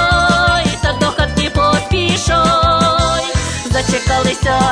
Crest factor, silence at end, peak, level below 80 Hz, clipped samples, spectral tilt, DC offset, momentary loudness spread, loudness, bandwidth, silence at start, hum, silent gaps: 14 dB; 0 s; 0 dBFS; -24 dBFS; under 0.1%; -4 dB/octave; under 0.1%; 5 LU; -13 LUFS; 11 kHz; 0 s; none; none